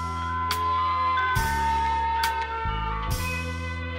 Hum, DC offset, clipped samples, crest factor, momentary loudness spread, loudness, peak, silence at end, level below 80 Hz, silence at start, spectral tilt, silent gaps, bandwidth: none; under 0.1%; under 0.1%; 18 dB; 5 LU; -26 LUFS; -8 dBFS; 0 s; -36 dBFS; 0 s; -4 dB/octave; none; 16 kHz